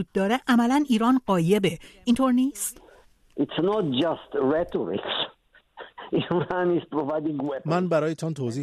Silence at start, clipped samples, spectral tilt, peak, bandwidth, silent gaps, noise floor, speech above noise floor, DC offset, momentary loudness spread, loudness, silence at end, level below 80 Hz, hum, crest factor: 0 s; under 0.1%; -5.5 dB/octave; -8 dBFS; 13.5 kHz; none; -56 dBFS; 32 dB; under 0.1%; 9 LU; -25 LUFS; 0 s; -58 dBFS; none; 16 dB